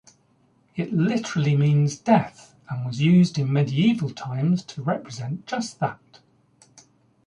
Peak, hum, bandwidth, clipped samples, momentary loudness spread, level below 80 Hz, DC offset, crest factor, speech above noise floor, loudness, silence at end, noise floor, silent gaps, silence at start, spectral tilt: -4 dBFS; none; 10.5 kHz; under 0.1%; 13 LU; -62 dBFS; under 0.1%; 20 dB; 40 dB; -23 LUFS; 1.3 s; -62 dBFS; none; 0.75 s; -7 dB/octave